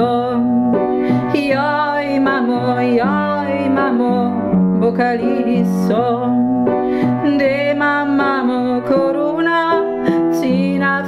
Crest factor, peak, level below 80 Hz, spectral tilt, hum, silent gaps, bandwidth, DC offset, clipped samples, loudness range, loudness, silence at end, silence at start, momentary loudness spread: 12 dB; -2 dBFS; -50 dBFS; -7.5 dB/octave; none; none; 13 kHz; under 0.1%; under 0.1%; 0 LU; -16 LUFS; 0 s; 0 s; 2 LU